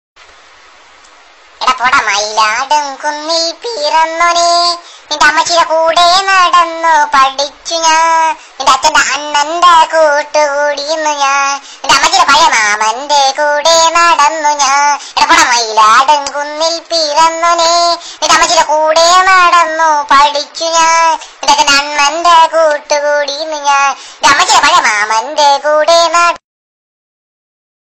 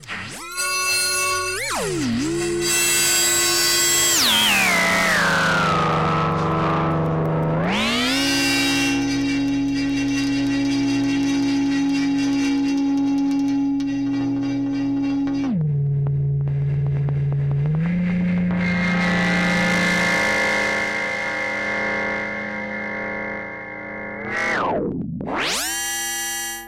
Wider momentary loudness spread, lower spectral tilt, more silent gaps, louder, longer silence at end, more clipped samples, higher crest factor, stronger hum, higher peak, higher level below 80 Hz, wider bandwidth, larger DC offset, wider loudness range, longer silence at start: about the same, 8 LU vs 9 LU; second, 0.5 dB/octave vs -3.5 dB/octave; neither; first, -9 LUFS vs -20 LUFS; first, 1.45 s vs 0 s; first, 0.1% vs under 0.1%; about the same, 10 dB vs 12 dB; neither; first, 0 dBFS vs -10 dBFS; about the same, -46 dBFS vs -46 dBFS; about the same, 16.5 kHz vs 16.5 kHz; first, 0.3% vs under 0.1%; second, 3 LU vs 8 LU; first, 1.6 s vs 0 s